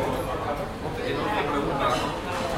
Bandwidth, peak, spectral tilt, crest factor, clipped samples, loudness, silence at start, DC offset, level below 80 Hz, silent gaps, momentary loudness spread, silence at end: 16.5 kHz; -12 dBFS; -5 dB/octave; 14 dB; under 0.1%; -27 LUFS; 0 s; under 0.1%; -42 dBFS; none; 6 LU; 0 s